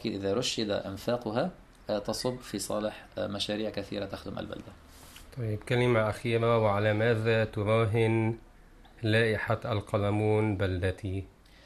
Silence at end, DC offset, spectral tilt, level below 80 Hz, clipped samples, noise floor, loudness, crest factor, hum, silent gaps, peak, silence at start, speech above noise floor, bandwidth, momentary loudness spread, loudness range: 0.35 s; under 0.1%; -6 dB/octave; -54 dBFS; under 0.1%; -54 dBFS; -30 LUFS; 18 dB; none; none; -12 dBFS; 0 s; 25 dB; 13.5 kHz; 13 LU; 7 LU